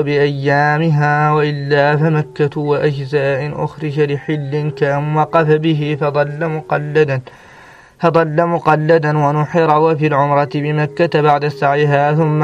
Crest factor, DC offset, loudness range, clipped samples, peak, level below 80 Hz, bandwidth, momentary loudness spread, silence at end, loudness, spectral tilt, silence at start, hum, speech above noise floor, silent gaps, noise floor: 14 dB; under 0.1%; 3 LU; under 0.1%; 0 dBFS; -54 dBFS; 7 kHz; 6 LU; 0 s; -15 LUFS; -8 dB/octave; 0 s; none; 27 dB; none; -41 dBFS